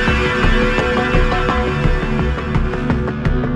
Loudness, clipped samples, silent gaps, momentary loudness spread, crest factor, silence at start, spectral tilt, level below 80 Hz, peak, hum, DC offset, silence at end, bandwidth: -17 LUFS; under 0.1%; none; 4 LU; 14 dB; 0 s; -6.5 dB/octave; -20 dBFS; -2 dBFS; none; under 0.1%; 0 s; 9.4 kHz